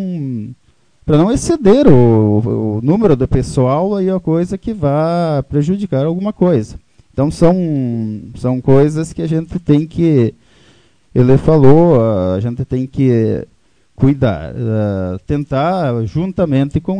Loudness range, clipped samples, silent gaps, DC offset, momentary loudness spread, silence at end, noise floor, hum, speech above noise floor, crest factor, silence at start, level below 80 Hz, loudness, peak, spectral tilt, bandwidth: 4 LU; 0.3%; none; under 0.1%; 11 LU; 0 s; -53 dBFS; none; 41 dB; 14 dB; 0 s; -34 dBFS; -14 LUFS; 0 dBFS; -8.5 dB/octave; 10 kHz